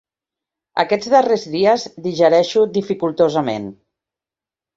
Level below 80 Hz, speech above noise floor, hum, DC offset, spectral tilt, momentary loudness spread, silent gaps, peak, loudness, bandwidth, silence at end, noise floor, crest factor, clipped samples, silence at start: -62 dBFS; 73 dB; none; under 0.1%; -5.5 dB/octave; 11 LU; none; 0 dBFS; -17 LUFS; 7.8 kHz; 1.05 s; -89 dBFS; 18 dB; under 0.1%; 0.75 s